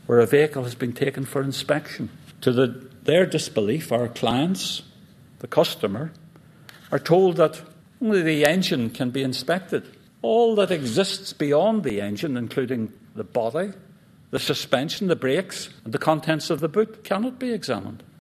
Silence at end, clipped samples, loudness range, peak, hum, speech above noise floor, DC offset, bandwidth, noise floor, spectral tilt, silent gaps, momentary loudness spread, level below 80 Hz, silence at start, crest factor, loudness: 0.25 s; under 0.1%; 4 LU; -2 dBFS; none; 27 dB; under 0.1%; 14 kHz; -50 dBFS; -5.5 dB/octave; none; 11 LU; -62 dBFS; 0.1 s; 22 dB; -23 LUFS